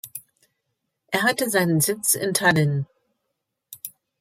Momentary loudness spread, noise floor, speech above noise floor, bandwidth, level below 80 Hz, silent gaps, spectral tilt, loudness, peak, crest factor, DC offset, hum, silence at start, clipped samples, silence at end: 19 LU; -79 dBFS; 58 dB; 16.5 kHz; -66 dBFS; none; -4 dB/octave; -21 LUFS; -4 dBFS; 20 dB; under 0.1%; none; 0.05 s; under 0.1%; 0.3 s